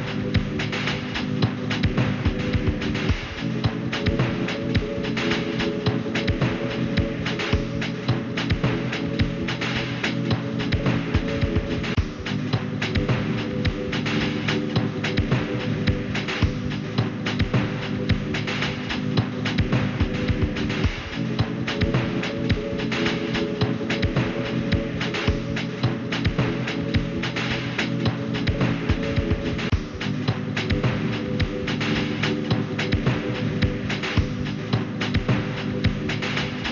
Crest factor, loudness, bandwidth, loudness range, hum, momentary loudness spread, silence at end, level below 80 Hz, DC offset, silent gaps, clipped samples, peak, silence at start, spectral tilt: 16 dB; -25 LUFS; 7.2 kHz; 1 LU; none; 3 LU; 0 s; -34 dBFS; under 0.1%; none; under 0.1%; -8 dBFS; 0 s; -6.5 dB/octave